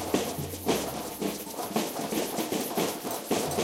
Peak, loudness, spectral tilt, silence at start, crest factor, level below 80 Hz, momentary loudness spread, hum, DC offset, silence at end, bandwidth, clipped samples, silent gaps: -10 dBFS; -31 LUFS; -3.5 dB/octave; 0 s; 20 dB; -58 dBFS; 4 LU; none; under 0.1%; 0 s; 16 kHz; under 0.1%; none